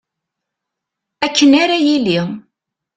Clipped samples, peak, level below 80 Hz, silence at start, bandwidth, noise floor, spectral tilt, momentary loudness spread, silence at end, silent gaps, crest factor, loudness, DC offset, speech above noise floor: under 0.1%; -2 dBFS; -58 dBFS; 1.2 s; 8.6 kHz; -80 dBFS; -4 dB/octave; 13 LU; 0.55 s; none; 16 dB; -13 LUFS; under 0.1%; 67 dB